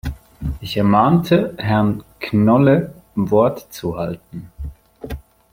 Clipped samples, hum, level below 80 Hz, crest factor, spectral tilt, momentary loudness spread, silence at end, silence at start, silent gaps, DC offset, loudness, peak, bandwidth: under 0.1%; none; -38 dBFS; 16 dB; -8 dB/octave; 20 LU; 0.35 s; 0.05 s; none; under 0.1%; -17 LUFS; -2 dBFS; 16.5 kHz